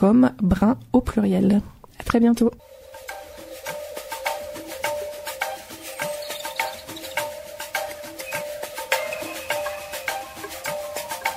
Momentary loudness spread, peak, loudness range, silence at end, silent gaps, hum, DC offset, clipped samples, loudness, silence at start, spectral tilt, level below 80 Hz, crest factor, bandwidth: 16 LU; -4 dBFS; 8 LU; 0 s; none; none; under 0.1%; under 0.1%; -25 LUFS; 0 s; -5 dB/octave; -44 dBFS; 20 dB; 16 kHz